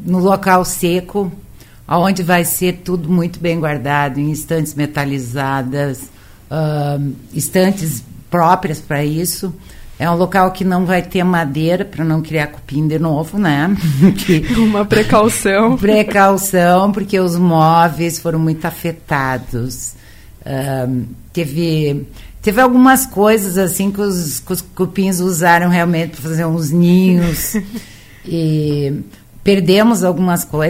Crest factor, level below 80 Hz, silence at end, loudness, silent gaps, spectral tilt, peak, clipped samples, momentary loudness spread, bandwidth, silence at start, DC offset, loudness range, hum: 14 dB; -38 dBFS; 0 s; -15 LUFS; none; -5.5 dB/octave; 0 dBFS; under 0.1%; 11 LU; 16.5 kHz; 0 s; under 0.1%; 6 LU; none